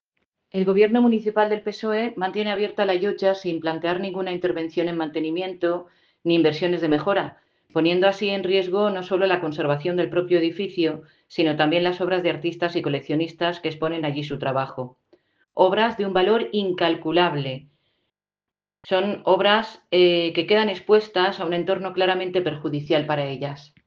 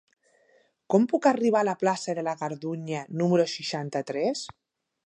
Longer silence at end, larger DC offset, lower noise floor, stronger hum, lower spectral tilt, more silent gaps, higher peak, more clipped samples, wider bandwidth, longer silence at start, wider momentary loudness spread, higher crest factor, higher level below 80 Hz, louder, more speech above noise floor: second, 0.25 s vs 0.6 s; neither; first, under -90 dBFS vs -64 dBFS; neither; first, -7 dB/octave vs -5.5 dB/octave; neither; first, -2 dBFS vs -8 dBFS; neither; second, 7 kHz vs 10.5 kHz; second, 0.55 s vs 0.9 s; about the same, 8 LU vs 10 LU; about the same, 20 dB vs 20 dB; first, -66 dBFS vs -74 dBFS; first, -22 LUFS vs -26 LUFS; first, over 68 dB vs 39 dB